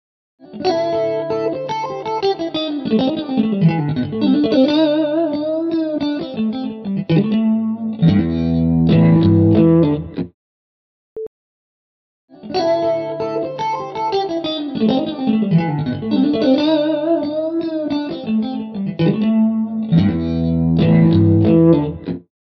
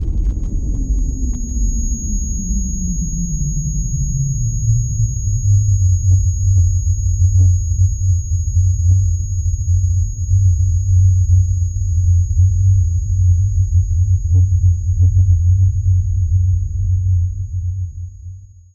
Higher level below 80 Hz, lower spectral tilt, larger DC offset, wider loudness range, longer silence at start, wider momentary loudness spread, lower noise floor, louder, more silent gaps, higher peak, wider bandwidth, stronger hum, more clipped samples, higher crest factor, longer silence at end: second, -42 dBFS vs -22 dBFS; about the same, -9 dB/octave vs -8.5 dB/octave; neither; about the same, 7 LU vs 5 LU; first, 0.45 s vs 0 s; first, 11 LU vs 8 LU; first, under -90 dBFS vs -34 dBFS; about the same, -17 LUFS vs -17 LUFS; first, 10.34-11.16 s, 11.27-12.28 s vs none; about the same, 0 dBFS vs -2 dBFS; second, 6 kHz vs 7 kHz; neither; neither; about the same, 16 dB vs 12 dB; about the same, 0.3 s vs 0.3 s